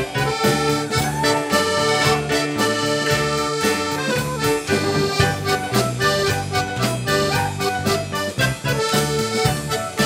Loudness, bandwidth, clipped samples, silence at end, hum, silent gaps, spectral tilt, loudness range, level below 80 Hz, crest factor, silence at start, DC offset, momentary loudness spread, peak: -19 LUFS; 16 kHz; under 0.1%; 0 s; none; none; -4 dB/octave; 2 LU; -42 dBFS; 18 dB; 0 s; under 0.1%; 4 LU; -2 dBFS